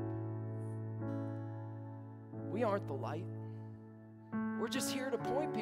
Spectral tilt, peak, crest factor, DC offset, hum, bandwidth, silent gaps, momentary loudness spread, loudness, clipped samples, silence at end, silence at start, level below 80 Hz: -5.5 dB/octave; -22 dBFS; 18 dB; under 0.1%; none; 16 kHz; none; 13 LU; -41 LUFS; under 0.1%; 0 s; 0 s; -74 dBFS